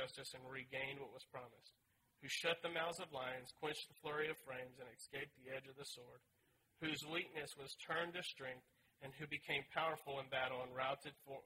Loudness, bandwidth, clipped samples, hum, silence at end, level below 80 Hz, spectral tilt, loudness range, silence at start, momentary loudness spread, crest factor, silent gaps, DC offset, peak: -46 LUFS; 16 kHz; under 0.1%; none; 0 s; -82 dBFS; -3 dB/octave; 4 LU; 0 s; 13 LU; 22 dB; none; under 0.1%; -26 dBFS